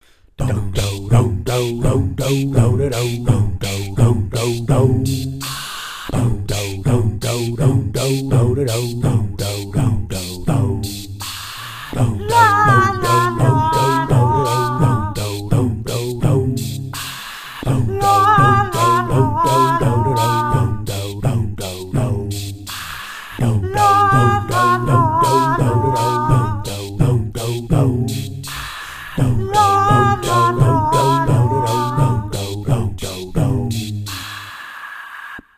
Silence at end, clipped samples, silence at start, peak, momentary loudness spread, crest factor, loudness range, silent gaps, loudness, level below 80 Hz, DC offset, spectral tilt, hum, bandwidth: 0.15 s; under 0.1%; 0.4 s; 0 dBFS; 13 LU; 16 dB; 5 LU; none; -17 LUFS; -32 dBFS; under 0.1%; -6 dB/octave; none; 16 kHz